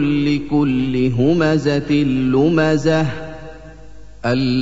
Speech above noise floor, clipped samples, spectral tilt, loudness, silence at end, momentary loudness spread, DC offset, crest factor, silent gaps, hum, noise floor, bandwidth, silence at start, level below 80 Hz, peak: 24 dB; under 0.1%; -7.5 dB/octave; -17 LUFS; 0 s; 12 LU; 2%; 14 dB; none; none; -39 dBFS; 8 kHz; 0 s; -42 dBFS; -4 dBFS